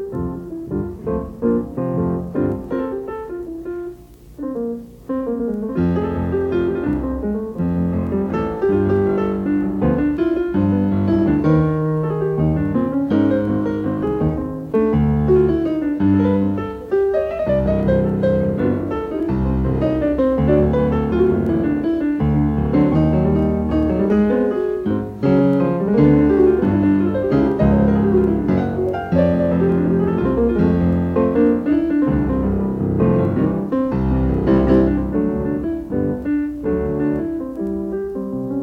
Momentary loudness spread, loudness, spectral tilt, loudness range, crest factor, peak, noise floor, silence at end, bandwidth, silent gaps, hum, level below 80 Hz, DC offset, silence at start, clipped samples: 9 LU; -18 LUFS; -10.5 dB/octave; 7 LU; 14 dB; -2 dBFS; -39 dBFS; 0 s; 5.8 kHz; none; none; -32 dBFS; under 0.1%; 0 s; under 0.1%